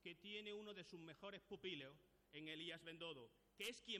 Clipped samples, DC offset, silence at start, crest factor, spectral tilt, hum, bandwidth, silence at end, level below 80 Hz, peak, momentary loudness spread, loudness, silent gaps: under 0.1%; under 0.1%; 0.05 s; 20 dB; -3.5 dB/octave; none; 16.5 kHz; 0 s; -84 dBFS; -36 dBFS; 8 LU; -55 LUFS; none